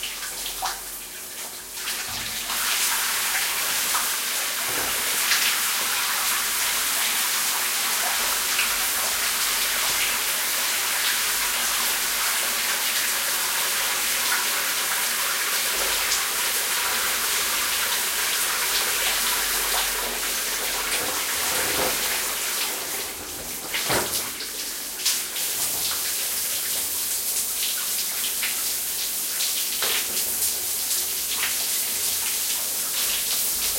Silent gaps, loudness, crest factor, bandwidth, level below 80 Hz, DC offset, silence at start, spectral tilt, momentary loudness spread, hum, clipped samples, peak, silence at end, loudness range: none; -22 LUFS; 18 dB; 16.5 kHz; -54 dBFS; under 0.1%; 0 s; 1.5 dB/octave; 6 LU; none; under 0.1%; -6 dBFS; 0 s; 3 LU